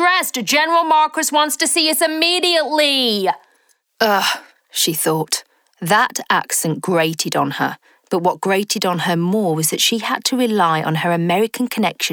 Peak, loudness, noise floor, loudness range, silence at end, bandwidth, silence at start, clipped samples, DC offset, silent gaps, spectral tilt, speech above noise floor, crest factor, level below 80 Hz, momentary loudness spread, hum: -2 dBFS; -17 LUFS; -60 dBFS; 4 LU; 0 s; over 20 kHz; 0 s; under 0.1%; under 0.1%; none; -3 dB/octave; 43 dB; 16 dB; -68 dBFS; 6 LU; none